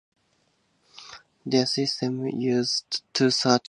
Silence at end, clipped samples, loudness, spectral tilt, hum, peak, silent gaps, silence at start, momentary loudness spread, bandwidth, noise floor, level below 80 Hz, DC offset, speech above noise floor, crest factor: 0.1 s; under 0.1%; -24 LUFS; -4 dB/octave; none; -6 dBFS; none; 0.95 s; 22 LU; 11 kHz; -69 dBFS; -72 dBFS; under 0.1%; 44 dB; 22 dB